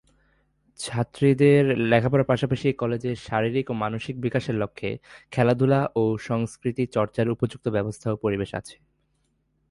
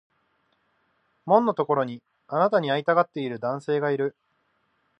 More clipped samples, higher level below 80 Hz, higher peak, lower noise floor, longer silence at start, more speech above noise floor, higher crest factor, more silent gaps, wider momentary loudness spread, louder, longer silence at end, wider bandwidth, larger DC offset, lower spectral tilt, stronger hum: neither; first, -54 dBFS vs -78 dBFS; about the same, -6 dBFS vs -6 dBFS; about the same, -70 dBFS vs -71 dBFS; second, 0.8 s vs 1.25 s; about the same, 47 dB vs 47 dB; about the same, 18 dB vs 20 dB; neither; about the same, 10 LU vs 10 LU; about the same, -24 LUFS vs -24 LUFS; about the same, 1 s vs 0.9 s; first, 11.5 kHz vs 8.4 kHz; neither; about the same, -7 dB/octave vs -7.5 dB/octave; neither